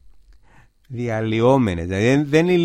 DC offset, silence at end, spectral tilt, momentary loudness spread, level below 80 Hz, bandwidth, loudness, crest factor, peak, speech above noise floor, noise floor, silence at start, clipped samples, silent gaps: under 0.1%; 0 s; -7 dB/octave; 10 LU; -46 dBFS; 12.5 kHz; -19 LUFS; 16 dB; -2 dBFS; 34 dB; -51 dBFS; 0.9 s; under 0.1%; none